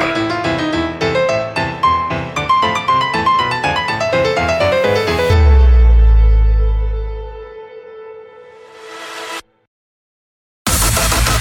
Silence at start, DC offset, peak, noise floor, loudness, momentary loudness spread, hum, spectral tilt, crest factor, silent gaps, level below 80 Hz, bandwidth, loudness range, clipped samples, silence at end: 0 s; under 0.1%; 0 dBFS; -38 dBFS; -14 LUFS; 20 LU; none; -4.5 dB/octave; 14 dB; 9.67-10.65 s; -18 dBFS; 18 kHz; 16 LU; under 0.1%; 0 s